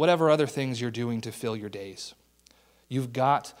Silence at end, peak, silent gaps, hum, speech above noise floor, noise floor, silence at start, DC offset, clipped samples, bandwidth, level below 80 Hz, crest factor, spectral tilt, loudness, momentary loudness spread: 0.1 s; -8 dBFS; none; none; 34 dB; -61 dBFS; 0 s; under 0.1%; under 0.1%; 16 kHz; -68 dBFS; 20 dB; -6 dB/octave; -28 LUFS; 16 LU